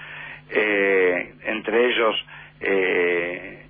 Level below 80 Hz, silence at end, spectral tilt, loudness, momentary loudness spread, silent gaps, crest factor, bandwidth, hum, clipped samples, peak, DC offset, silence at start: -58 dBFS; 0.05 s; -7.5 dB/octave; -21 LUFS; 11 LU; none; 14 dB; 4.5 kHz; none; under 0.1%; -8 dBFS; under 0.1%; 0 s